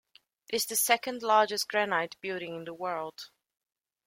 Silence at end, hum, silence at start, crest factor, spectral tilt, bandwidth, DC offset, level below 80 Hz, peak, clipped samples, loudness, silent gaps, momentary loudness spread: 0.8 s; none; 0.5 s; 22 dB; -1.5 dB/octave; 16.5 kHz; under 0.1%; -78 dBFS; -8 dBFS; under 0.1%; -29 LUFS; none; 14 LU